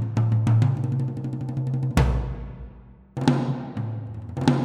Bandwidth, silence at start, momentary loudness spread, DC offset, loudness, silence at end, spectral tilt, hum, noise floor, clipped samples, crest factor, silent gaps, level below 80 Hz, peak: 11.5 kHz; 0 s; 16 LU; under 0.1%; -25 LUFS; 0 s; -8 dB/octave; none; -46 dBFS; under 0.1%; 20 dB; none; -34 dBFS; -4 dBFS